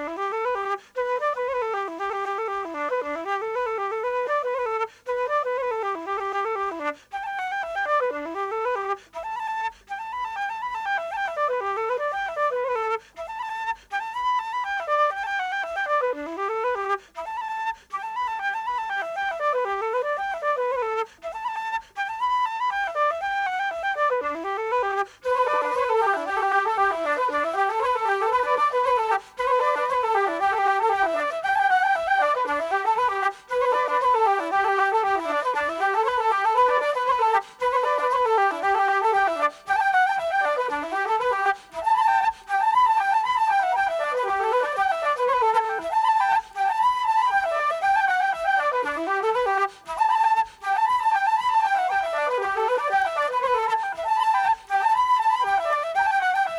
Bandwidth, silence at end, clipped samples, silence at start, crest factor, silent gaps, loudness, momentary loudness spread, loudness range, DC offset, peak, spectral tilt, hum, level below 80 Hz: 14 kHz; 0 s; under 0.1%; 0 s; 16 dB; none; -24 LUFS; 8 LU; 5 LU; under 0.1%; -8 dBFS; -2 dB/octave; none; -62 dBFS